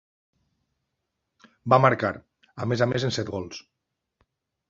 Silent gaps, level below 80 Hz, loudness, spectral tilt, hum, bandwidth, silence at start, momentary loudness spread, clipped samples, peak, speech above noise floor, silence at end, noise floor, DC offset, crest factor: none; -58 dBFS; -24 LUFS; -6 dB/octave; none; 7.6 kHz; 1.65 s; 20 LU; under 0.1%; -2 dBFS; 57 dB; 1.1 s; -81 dBFS; under 0.1%; 26 dB